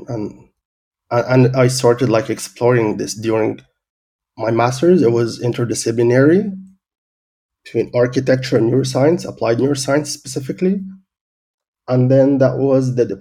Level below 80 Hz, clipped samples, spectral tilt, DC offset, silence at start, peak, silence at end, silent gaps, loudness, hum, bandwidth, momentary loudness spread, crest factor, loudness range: -54 dBFS; under 0.1%; -6.5 dB/octave; under 0.1%; 0 s; 0 dBFS; 0 s; 0.65-0.91 s, 3.90-4.19 s, 6.98-7.49 s, 11.21-11.58 s, 11.68-11.73 s; -16 LUFS; none; 14.5 kHz; 12 LU; 16 dB; 2 LU